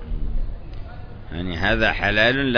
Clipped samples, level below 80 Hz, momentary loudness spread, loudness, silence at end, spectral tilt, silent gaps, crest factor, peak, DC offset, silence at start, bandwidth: under 0.1%; -28 dBFS; 21 LU; -21 LUFS; 0 s; -6 dB/octave; none; 18 dB; -4 dBFS; under 0.1%; 0 s; 5.4 kHz